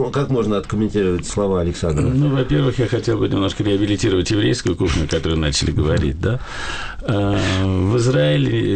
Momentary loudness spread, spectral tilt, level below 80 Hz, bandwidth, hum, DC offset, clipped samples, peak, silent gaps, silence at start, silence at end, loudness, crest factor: 4 LU; -6 dB/octave; -32 dBFS; 9.2 kHz; none; under 0.1%; under 0.1%; -8 dBFS; none; 0 s; 0 s; -19 LUFS; 10 dB